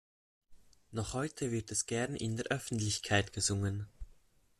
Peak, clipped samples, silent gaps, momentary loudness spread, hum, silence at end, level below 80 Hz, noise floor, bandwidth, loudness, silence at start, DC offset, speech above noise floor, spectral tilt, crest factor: -16 dBFS; under 0.1%; none; 9 LU; none; 0.45 s; -58 dBFS; -64 dBFS; 13.5 kHz; -35 LUFS; 0.5 s; under 0.1%; 29 dB; -4 dB/octave; 22 dB